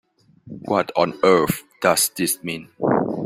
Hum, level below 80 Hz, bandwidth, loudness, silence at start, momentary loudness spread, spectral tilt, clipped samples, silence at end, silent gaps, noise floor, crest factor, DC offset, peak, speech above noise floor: none; -56 dBFS; 16.5 kHz; -20 LUFS; 0.45 s; 11 LU; -4 dB/octave; under 0.1%; 0 s; none; -43 dBFS; 20 dB; under 0.1%; -2 dBFS; 24 dB